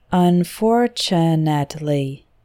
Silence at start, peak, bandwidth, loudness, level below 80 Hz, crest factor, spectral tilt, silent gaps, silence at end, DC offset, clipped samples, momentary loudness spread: 0.1 s; -4 dBFS; 15.5 kHz; -18 LUFS; -52 dBFS; 14 dB; -6.5 dB/octave; none; 0.3 s; under 0.1%; under 0.1%; 6 LU